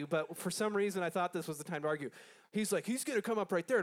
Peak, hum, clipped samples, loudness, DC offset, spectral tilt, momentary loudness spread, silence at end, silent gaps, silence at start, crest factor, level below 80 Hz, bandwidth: -20 dBFS; none; under 0.1%; -36 LUFS; under 0.1%; -4.5 dB/octave; 7 LU; 0 s; none; 0 s; 16 dB; -88 dBFS; 17.5 kHz